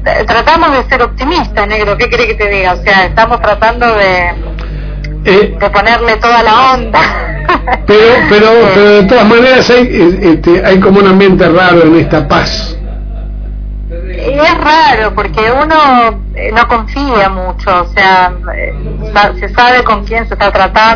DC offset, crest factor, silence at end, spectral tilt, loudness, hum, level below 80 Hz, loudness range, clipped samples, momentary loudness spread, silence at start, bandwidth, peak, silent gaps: under 0.1%; 8 dB; 0 s; -6 dB/octave; -7 LUFS; 50 Hz at -20 dBFS; -20 dBFS; 5 LU; 3%; 13 LU; 0 s; 5.4 kHz; 0 dBFS; none